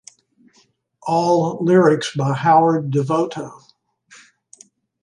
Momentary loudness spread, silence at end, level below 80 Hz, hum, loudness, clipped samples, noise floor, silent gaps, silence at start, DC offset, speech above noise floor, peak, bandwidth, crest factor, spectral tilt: 13 LU; 1.5 s; -66 dBFS; none; -17 LUFS; under 0.1%; -59 dBFS; none; 1.05 s; under 0.1%; 43 dB; -2 dBFS; 11 kHz; 16 dB; -6.5 dB/octave